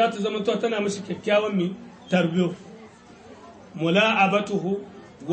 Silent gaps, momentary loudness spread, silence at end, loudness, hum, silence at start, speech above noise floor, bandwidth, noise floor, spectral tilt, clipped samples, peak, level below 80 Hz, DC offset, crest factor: none; 19 LU; 0 s; -23 LUFS; none; 0 s; 24 dB; 8.8 kHz; -47 dBFS; -5.5 dB/octave; under 0.1%; -6 dBFS; -66 dBFS; under 0.1%; 18 dB